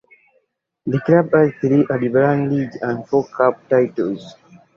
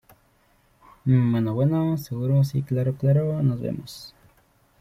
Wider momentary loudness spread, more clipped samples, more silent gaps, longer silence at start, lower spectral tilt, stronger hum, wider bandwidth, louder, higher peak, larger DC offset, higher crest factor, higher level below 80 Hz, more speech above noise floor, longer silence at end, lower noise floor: second, 9 LU vs 12 LU; neither; neither; second, 0.85 s vs 1.05 s; about the same, -9.5 dB/octave vs -9 dB/octave; neither; second, 7 kHz vs 15.5 kHz; first, -18 LUFS vs -23 LUFS; first, -2 dBFS vs -8 dBFS; neither; about the same, 16 dB vs 16 dB; about the same, -58 dBFS vs -56 dBFS; first, 48 dB vs 40 dB; second, 0.45 s vs 0.7 s; about the same, -65 dBFS vs -62 dBFS